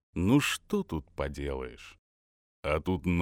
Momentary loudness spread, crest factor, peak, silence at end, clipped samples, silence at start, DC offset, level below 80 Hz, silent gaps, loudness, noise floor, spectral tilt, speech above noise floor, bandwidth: 16 LU; 18 dB; -14 dBFS; 0 s; under 0.1%; 0.15 s; under 0.1%; -46 dBFS; 1.99-2.63 s; -31 LUFS; under -90 dBFS; -5.5 dB/octave; over 60 dB; 17 kHz